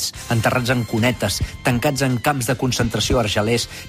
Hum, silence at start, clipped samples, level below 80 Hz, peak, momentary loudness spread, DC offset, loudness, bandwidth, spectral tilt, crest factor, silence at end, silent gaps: none; 0 s; under 0.1%; -36 dBFS; -6 dBFS; 3 LU; under 0.1%; -19 LUFS; 15.5 kHz; -4.5 dB/octave; 14 dB; 0 s; none